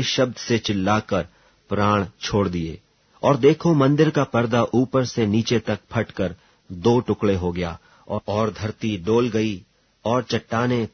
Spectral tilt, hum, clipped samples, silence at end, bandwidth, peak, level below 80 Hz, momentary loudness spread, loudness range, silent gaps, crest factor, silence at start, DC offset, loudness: -6 dB/octave; none; under 0.1%; 0.05 s; 6.6 kHz; -4 dBFS; -50 dBFS; 12 LU; 5 LU; none; 18 dB; 0 s; under 0.1%; -22 LUFS